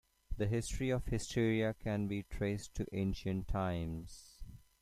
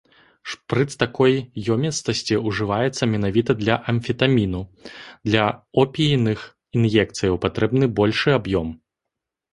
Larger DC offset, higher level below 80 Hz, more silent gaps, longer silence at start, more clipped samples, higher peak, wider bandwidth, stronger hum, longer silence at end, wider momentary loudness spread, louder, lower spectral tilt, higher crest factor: neither; about the same, -48 dBFS vs -46 dBFS; neither; second, 0.3 s vs 0.45 s; neither; second, -20 dBFS vs -2 dBFS; first, 15 kHz vs 11.5 kHz; neither; second, 0.2 s vs 0.8 s; first, 18 LU vs 12 LU; second, -38 LUFS vs -21 LUFS; about the same, -6 dB/octave vs -6 dB/octave; about the same, 16 dB vs 20 dB